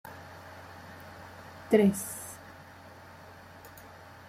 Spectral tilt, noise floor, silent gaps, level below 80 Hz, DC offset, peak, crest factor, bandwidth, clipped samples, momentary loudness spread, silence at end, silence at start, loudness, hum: -6 dB/octave; -50 dBFS; none; -68 dBFS; under 0.1%; -10 dBFS; 24 dB; 16 kHz; under 0.1%; 25 LU; 0 s; 0.05 s; -28 LUFS; none